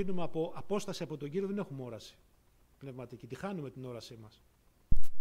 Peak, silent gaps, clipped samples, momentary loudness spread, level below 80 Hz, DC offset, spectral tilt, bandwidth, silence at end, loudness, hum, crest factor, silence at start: -12 dBFS; none; under 0.1%; 14 LU; -42 dBFS; under 0.1%; -6.5 dB/octave; 9.4 kHz; 0 s; -40 LUFS; none; 16 dB; 0 s